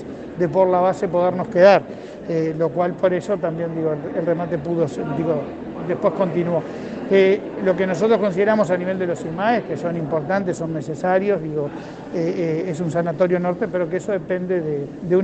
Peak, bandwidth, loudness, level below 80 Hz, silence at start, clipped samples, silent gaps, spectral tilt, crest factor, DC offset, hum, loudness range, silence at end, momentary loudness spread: 0 dBFS; 8.6 kHz; -20 LUFS; -56 dBFS; 0 s; under 0.1%; none; -7.5 dB/octave; 20 dB; under 0.1%; none; 4 LU; 0 s; 9 LU